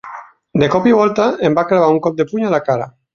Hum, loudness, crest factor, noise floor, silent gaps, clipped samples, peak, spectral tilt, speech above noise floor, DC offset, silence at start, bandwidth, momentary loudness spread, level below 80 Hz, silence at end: none; -15 LUFS; 14 dB; -34 dBFS; none; under 0.1%; -2 dBFS; -7 dB/octave; 21 dB; under 0.1%; 0.05 s; 7.2 kHz; 9 LU; -52 dBFS; 0.25 s